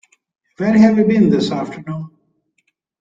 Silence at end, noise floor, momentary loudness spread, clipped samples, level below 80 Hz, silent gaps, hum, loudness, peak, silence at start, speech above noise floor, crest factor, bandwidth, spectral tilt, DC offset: 0.95 s; -67 dBFS; 17 LU; under 0.1%; -56 dBFS; none; none; -14 LUFS; -2 dBFS; 0.6 s; 53 dB; 16 dB; 7.8 kHz; -7.5 dB/octave; under 0.1%